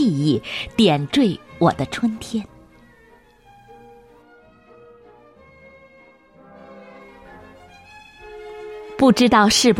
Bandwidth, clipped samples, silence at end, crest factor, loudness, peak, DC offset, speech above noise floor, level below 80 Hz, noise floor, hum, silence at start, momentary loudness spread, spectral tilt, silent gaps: 16 kHz; under 0.1%; 0 s; 18 dB; -18 LUFS; -2 dBFS; under 0.1%; 34 dB; -52 dBFS; -52 dBFS; none; 0 s; 28 LU; -4.5 dB/octave; none